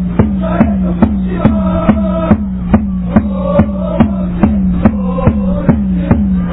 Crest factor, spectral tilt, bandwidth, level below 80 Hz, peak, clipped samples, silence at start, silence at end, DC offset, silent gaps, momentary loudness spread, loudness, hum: 12 dB; -13 dB/octave; 4 kHz; -20 dBFS; 0 dBFS; under 0.1%; 0 s; 0 s; under 0.1%; none; 1 LU; -12 LUFS; none